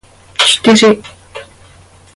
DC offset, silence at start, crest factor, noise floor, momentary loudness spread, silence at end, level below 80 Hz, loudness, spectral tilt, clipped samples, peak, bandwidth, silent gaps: under 0.1%; 0.4 s; 14 dB; -42 dBFS; 24 LU; 0.7 s; -48 dBFS; -9 LUFS; -3 dB/octave; under 0.1%; 0 dBFS; 11.5 kHz; none